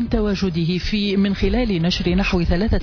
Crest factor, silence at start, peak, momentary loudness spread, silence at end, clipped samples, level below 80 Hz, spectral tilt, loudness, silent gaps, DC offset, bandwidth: 12 dB; 0 s; -8 dBFS; 2 LU; 0 s; under 0.1%; -26 dBFS; -6.5 dB/octave; -20 LUFS; none; under 0.1%; 5.4 kHz